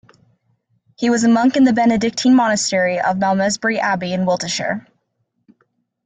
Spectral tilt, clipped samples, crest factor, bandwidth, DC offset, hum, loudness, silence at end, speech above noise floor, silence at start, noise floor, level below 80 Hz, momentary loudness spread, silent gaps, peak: -4.5 dB/octave; under 0.1%; 14 dB; 9.4 kHz; under 0.1%; none; -16 LUFS; 1.25 s; 54 dB; 1 s; -70 dBFS; -58 dBFS; 7 LU; none; -4 dBFS